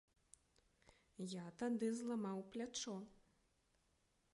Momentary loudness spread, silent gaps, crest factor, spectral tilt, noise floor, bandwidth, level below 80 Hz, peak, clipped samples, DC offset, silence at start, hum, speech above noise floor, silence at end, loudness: 11 LU; none; 18 dB; -4.5 dB/octave; -81 dBFS; 11.5 kHz; -82 dBFS; -32 dBFS; under 0.1%; under 0.1%; 1.2 s; none; 36 dB; 1.2 s; -46 LUFS